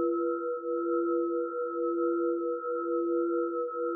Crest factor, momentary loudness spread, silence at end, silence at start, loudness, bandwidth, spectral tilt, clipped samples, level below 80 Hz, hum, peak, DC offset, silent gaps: 10 dB; 3 LU; 0 s; 0 s; -31 LUFS; 1.5 kHz; 10.5 dB/octave; under 0.1%; under -90 dBFS; none; -20 dBFS; under 0.1%; none